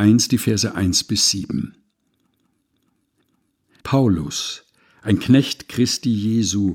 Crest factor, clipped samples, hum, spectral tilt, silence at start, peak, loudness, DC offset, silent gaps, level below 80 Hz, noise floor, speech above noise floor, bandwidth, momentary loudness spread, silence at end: 18 dB; under 0.1%; none; -4.5 dB/octave; 0 s; -2 dBFS; -19 LUFS; under 0.1%; none; -48 dBFS; -68 dBFS; 49 dB; 17.5 kHz; 12 LU; 0 s